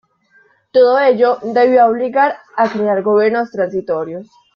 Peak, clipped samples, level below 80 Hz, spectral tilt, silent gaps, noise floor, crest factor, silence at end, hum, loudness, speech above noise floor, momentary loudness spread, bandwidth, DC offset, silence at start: -2 dBFS; under 0.1%; -62 dBFS; -7 dB/octave; none; -53 dBFS; 14 dB; 0.3 s; none; -14 LUFS; 40 dB; 10 LU; 6.4 kHz; under 0.1%; 0.75 s